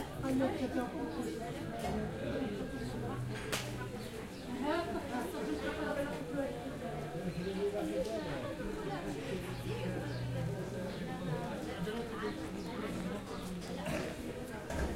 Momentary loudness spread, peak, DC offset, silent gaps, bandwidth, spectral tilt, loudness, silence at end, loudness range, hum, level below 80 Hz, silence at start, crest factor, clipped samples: 5 LU; -20 dBFS; under 0.1%; none; 16 kHz; -6 dB/octave; -39 LUFS; 0 s; 2 LU; none; -52 dBFS; 0 s; 18 dB; under 0.1%